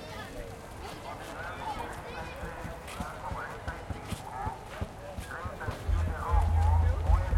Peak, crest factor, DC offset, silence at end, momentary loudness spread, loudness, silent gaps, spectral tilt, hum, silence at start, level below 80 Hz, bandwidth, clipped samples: -12 dBFS; 18 dB; under 0.1%; 0 s; 14 LU; -35 LUFS; none; -6 dB/octave; none; 0 s; -36 dBFS; 13.5 kHz; under 0.1%